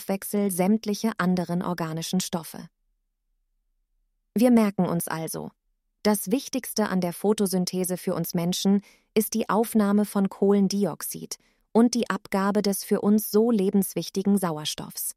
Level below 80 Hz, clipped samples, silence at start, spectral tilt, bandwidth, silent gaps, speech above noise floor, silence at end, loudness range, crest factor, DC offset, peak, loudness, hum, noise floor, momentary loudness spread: -64 dBFS; under 0.1%; 0 s; -5.5 dB/octave; 16 kHz; none; 50 dB; 0.05 s; 4 LU; 18 dB; under 0.1%; -8 dBFS; -25 LUFS; none; -74 dBFS; 9 LU